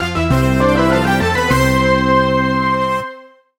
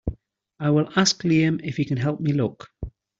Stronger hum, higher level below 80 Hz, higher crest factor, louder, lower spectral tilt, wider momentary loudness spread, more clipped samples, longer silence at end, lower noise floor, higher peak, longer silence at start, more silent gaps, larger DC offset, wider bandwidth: neither; first, -30 dBFS vs -44 dBFS; about the same, 14 dB vs 18 dB; first, -14 LUFS vs -22 LUFS; about the same, -6 dB/octave vs -5 dB/octave; second, 4 LU vs 17 LU; neither; about the same, 0.35 s vs 0.3 s; second, -37 dBFS vs -48 dBFS; first, 0 dBFS vs -6 dBFS; about the same, 0 s vs 0.05 s; neither; neither; first, 19 kHz vs 7.8 kHz